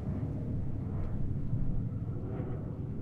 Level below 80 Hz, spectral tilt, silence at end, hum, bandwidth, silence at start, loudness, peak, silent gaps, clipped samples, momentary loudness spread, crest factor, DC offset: -40 dBFS; -11.5 dB/octave; 0 s; none; 3.2 kHz; 0 s; -37 LUFS; -20 dBFS; none; under 0.1%; 3 LU; 14 dB; under 0.1%